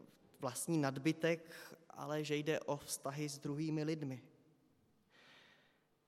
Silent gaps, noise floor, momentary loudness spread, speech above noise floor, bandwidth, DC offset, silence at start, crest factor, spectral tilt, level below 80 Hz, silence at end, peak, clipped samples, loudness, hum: none; -74 dBFS; 13 LU; 34 dB; 16 kHz; under 0.1%; 0.4 s; 20 dB; -5 dB/octave; -84 dBFS; 0.65 s; -22 dBFS; under 0.1%; -40 LUFS; none